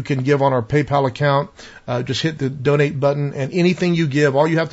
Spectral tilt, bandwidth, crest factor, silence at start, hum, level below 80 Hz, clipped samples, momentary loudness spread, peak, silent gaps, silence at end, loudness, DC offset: -6.5 dB/octave; 8 kHz; 14 dB; 0 s; none; -50 dBFS; under 0.1%; 6 LU; -4 dBFS; none; 0 s; -18 LUFS; under 0.1%